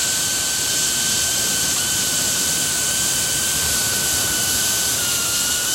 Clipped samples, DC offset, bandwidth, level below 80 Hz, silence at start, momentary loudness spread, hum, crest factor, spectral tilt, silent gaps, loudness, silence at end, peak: under 0.1%; under 0.1%; 16.5 kHz; -46 dBFS; 0 s; 1 LU; none; 14 dB; 0 dB/octave; none; -17 LUFS; 0 s; -6 dBFS